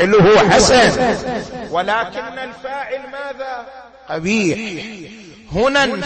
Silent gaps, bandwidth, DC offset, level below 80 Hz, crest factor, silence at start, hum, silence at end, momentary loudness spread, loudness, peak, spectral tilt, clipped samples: none; 8.8 kHz; under 0.1%; -40 dBFS; 14 dB; 0 s; none; 0 s; 19 LU; -15 LUFS; -2 dBFS; -4 dB/octave; under 0.1%